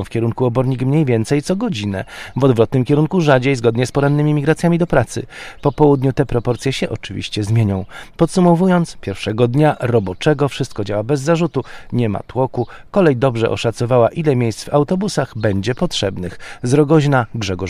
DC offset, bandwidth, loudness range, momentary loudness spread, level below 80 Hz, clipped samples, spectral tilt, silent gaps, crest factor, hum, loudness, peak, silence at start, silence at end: under 0.1%; 13 kHz; 2 LU; 10 LU; -40 dBFS; under 0.1%; -6.5 dB/octave; none; 16 dB; none; -17 LUFS; 0 dBFS; 0 s; 0 s